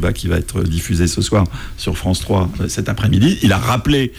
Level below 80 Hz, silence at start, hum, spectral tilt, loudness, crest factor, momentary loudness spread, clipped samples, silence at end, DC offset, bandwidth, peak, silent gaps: -28 dBFS; 0 s; none; -5.5 dB/octave; -17 LUFS; 12 dB; 7 LU; under 0.1%; 0 s; under 0.1%; 19 kHz; -4 dBFS; none